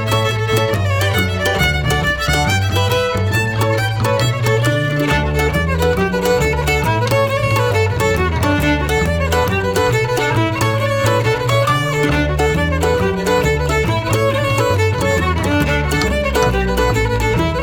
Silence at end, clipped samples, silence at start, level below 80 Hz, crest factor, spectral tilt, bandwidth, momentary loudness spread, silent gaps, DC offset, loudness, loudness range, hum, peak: 0 s; under 0.1%; 0 s; -26 dBFS; 12 dB; -5 dB/octave; 19 kHz; 1 LU; none; 0.1%; -16 LUFS; 0 LU; none; -2 dBFS